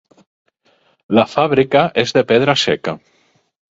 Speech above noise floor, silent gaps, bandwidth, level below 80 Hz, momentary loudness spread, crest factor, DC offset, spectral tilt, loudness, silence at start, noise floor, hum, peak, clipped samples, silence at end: 44 dB; none; 7.8 kHz; -54 dBFS; 8 LU; 18 dB; under 0.1%; -5 dB/octave; -15 LUFS; 1.1 s; -58 dBFS; none; 0 dBFS; under 0.1%; 0.8 s